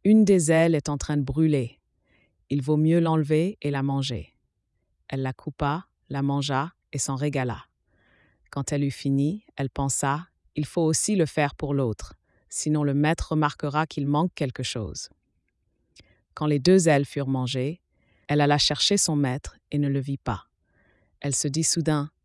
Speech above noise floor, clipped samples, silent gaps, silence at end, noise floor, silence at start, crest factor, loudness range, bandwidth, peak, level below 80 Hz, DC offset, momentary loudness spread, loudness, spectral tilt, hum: 50 dB; under 0.1%; none; 0.15 s; -74 dBFS; 0.05 s; 18 dB; 6 LU; 12 kHz; -8 dBFS; -50 dBFS; under 0.1%; 13 LU; -25 LUFS; -5 dB/octave; none